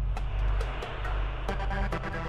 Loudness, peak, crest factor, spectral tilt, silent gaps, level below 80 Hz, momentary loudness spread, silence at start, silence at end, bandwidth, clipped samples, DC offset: -33 LUFS; -14 dBFS; 16 dB; -6.5 dB/octave; none; -32 dBFS; 3 LU; 0 s; 0 s; 8.4 kHz; under 0.1%; under 0.1%